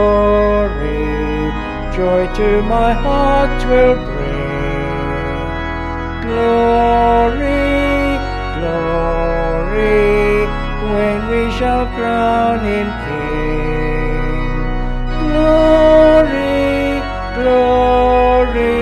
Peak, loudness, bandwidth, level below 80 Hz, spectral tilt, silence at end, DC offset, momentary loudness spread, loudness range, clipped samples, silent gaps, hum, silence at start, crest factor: 0 dBFS; -15 LUFS; 9.8 kHz; -22 dBFS; -7 dB/octave; 0 s; under 0.1%; 9 LU; 5 LU; under 0.1%; none; none; 0 s; 14 dB